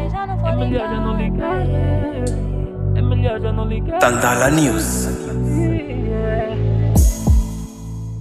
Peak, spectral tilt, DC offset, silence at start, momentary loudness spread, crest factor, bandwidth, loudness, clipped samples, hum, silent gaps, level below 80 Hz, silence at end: 0 dBFS; -6 dB/octave; under 0.1%; 0 s; 8 LU; 18 dB; 15 kHz; -19 LUFS; under 0.1%; none; none; -24 dBFS; 0 s